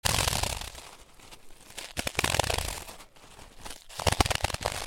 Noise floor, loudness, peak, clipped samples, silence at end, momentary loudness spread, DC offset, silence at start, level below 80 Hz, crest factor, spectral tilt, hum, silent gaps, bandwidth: -51 dBFS; -29 LUFS; -4 dBFS; under 0.1%; 0 s; 24 LU; under 0.1%; 0.05 s; -42 dBFS; 28 dB; -2.5 dB/octave; none; none; 17 kHz